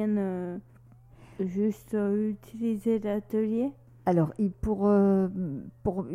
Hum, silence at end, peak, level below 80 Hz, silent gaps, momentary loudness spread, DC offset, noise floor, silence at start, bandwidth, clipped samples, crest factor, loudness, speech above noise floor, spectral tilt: none; 0 s; -12 dBFS; -50 dBFS; none; 11 LU; under 0.1%; -53 dBFS; 0 s; 13.5 kHz; under 0.1%; 16 dB; -29 LUFS; 26 dB; -9.5 dB/octave